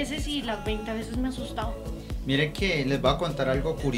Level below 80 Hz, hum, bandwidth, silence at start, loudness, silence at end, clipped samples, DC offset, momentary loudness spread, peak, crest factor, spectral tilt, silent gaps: -38 dBFS; none; 16 kHz; 0 s; -28 LUFS; 0 s; under 0.1%; under 0.1%; 9 LU; -8 dBFS; 20 dB; -5.5 dB/octave; none